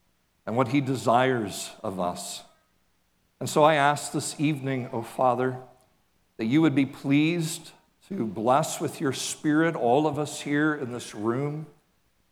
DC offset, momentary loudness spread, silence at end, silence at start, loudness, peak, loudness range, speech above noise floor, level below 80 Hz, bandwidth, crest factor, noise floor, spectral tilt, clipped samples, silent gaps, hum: under 0.1%; 12 LU; 0.65 s; 0.45 s; -26 LUFS; -6 dBFS; 1 LU; 44 dB; -70 dBFS; 16.5 kHz; 22 dB; -70 dBFS; -5 dB/octave; under 0.1%; none; none